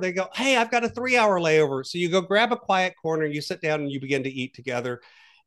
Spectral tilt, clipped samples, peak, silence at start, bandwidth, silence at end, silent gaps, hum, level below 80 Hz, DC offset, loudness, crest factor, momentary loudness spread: -4.5 dB/octave; under 0.1%; -6 dBFS; 0 s; 12.5 kHz; 0.5 s; none; none; -68 dBFS; under 0.1%; -24 LUFS; 18 dB; 10 LU